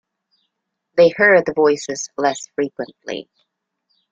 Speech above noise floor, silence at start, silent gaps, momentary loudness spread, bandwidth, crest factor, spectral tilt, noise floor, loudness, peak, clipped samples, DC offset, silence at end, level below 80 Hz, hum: 58 dB; 0.95 s; none; 17 LU; 8 kHz; 18 dB; -4 dB/octave; -75 dBFS; -17 LUFS; -2 dBFS; under 0.1%; under 0.1%; 0.9 s; -64 dBFS; none